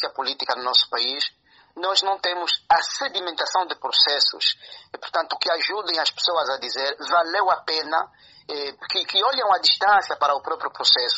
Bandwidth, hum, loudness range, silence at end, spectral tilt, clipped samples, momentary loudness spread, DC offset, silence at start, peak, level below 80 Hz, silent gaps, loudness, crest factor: 8 kHz; none; 2 LU; 0 s; 3.5 dB/octave; under 0.1%; 10 LU; under 0.1%; 0 s; -4 dBFS; -70 dBFS; none; -21 LUFS; 20 dB